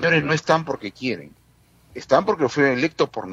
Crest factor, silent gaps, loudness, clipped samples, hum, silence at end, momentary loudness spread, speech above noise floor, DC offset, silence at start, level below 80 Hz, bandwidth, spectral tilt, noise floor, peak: 20 dB; none; -21 LUFS; under 0.1%; none; 0 s; 13 LU; 35 dB; under 0.1%; 0 s; -58 dBFS; 11 kHz; -5.5 dB/octave; -56 dBFS; -2 dBFS